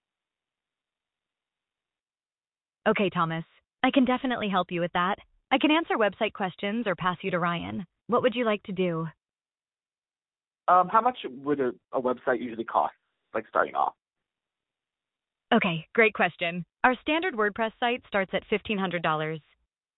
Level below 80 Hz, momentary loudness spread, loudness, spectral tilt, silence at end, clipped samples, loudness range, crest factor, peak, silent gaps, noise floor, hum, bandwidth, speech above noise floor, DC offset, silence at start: -64 dBFS; 8 LU; -27 LUFS; -9.5 dB/octave; 0.6 s; under 0.1%; 5 LU; 22 dB; -6 dBFS; none; under -90 dBFS; none; 4.1 kHz; over 64 dB; under 0.1%; 2.85 s